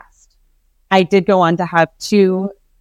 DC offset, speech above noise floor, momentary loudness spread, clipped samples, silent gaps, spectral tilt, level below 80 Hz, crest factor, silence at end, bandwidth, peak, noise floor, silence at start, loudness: under 0.1%; 43 dB; 5 LU; under 0.1%; none; -6 dB/octave; -56 dBFS; 16 dB; 0.3 s; 13.5 kHz; 0 dBFS; -57 dBFS; 0.9 s; -14 LUFS